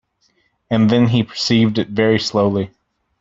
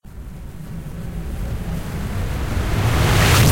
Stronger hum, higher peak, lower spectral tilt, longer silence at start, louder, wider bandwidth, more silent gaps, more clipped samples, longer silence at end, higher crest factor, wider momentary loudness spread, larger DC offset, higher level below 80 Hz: neither; about the same, -2 dBFS vs -4 dBFS; first, -6 dB/octave vs -4.5 dB/octave; first, 0.7 s vs 0.05 s; first, -16 LUFS vs -21 LUFS; second, 7.8 kHz vs 16.5 kHz; neither; neither; first, 0.55 s vs 0 s; about the same, 16 dB vs 16 dB; second, 7 LU vs 20 LU; neither; second, -52 dBFS vs -26 dBFS